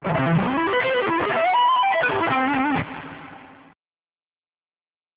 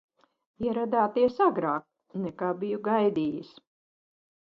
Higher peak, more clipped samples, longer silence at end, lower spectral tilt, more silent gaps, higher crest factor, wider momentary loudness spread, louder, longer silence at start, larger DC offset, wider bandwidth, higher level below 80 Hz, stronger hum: about the same, -10 dBFS vs -10 dBFS; neither; first, 1.6 s vs 0.95 s; about the same, -9.5 dB/octave vs -9 dB/octave; neither; about the same, 14 dB vs 18 dB; about the same, 14 LU vs 12 LU; first, -20 LUFS vs -28 LUFS; second, 0 s vs 0.6 s; neither; second, 4 kHz vs 6 kHz; first, -54 dBFS vs -66 dBFS; neither